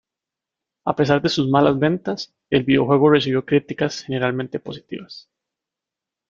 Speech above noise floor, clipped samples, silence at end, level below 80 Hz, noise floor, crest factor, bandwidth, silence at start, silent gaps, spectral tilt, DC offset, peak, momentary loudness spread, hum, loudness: 67 dB; under 0.1%; 1.1 s; -56 dBFS; -87 dBFS; 20 dB; 7.4 kHz; 0.85 s; none; -6.5 dB/octave; under 0.1%; 0 dBFS; 16 LU; none; -19 LUFS